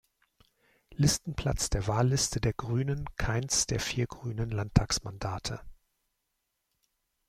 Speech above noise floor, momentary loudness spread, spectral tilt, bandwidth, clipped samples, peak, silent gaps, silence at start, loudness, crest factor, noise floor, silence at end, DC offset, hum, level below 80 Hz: 51 dB; 9 LU; -4 dB/octave; 15.5 kHz; under 0.1%; -8 dBFS; none; 0.9 s; -30 LUFS; 24 dB; -81 dBFS; 1.55 s; under 0.1%; none; -44 dBFS